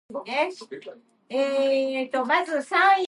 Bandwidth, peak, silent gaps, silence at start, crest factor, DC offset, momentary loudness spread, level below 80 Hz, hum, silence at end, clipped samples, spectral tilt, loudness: 11.5 kHz; -8 dBFS; none; 0.1 s; 16 dB; under 0.1%; 18 LU; -82 dBFS; none; 0 s; under 0.1%; -3 dB/octave; -24 LUFS